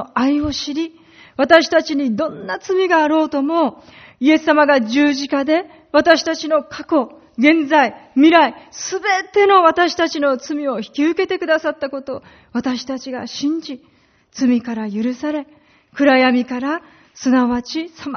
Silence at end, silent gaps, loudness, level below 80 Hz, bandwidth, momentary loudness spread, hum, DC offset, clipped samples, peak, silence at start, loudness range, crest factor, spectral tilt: 0 s; none; -17 LUFS; -54 dBFS; 6.6 kHz; 14 LU; none; under 0.1%; under 0.1%; 0 dBFS; 0 s; 8 LU; 16 dB; -2 dB/octave